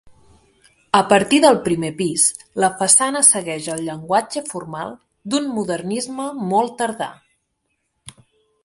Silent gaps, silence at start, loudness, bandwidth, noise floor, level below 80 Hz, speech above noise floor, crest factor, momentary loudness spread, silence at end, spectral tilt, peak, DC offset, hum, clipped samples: none; 0.05 s; -18 LUFS; 12 kHz; -72 dBFS; -60 dBFS; 53 dB; 20 dB; 16 LU; 0.55 s; -3 dB/octave; 0 dBFS; under 0.1%; none; under 0.1%